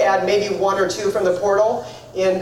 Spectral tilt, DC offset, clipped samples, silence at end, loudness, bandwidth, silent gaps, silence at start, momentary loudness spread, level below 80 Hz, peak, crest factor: -4 dB/octave; under 0.1%; under 0.1%; 0 s; -19 LUFS; 15.5 kHz; none; 0 s; 5 LU; -54 dBFS; -6 dBFS; 12 dB